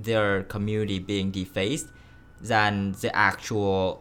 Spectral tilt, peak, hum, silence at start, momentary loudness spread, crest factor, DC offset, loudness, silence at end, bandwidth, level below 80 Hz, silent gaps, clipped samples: -5 dB/octave; -4 dBFS; none; 0 s; 7 LU; 22 dB; under 0.1%; -26 LUFS; 0 s; 17.5 kHz; -52 dBFS; none; under 0.1%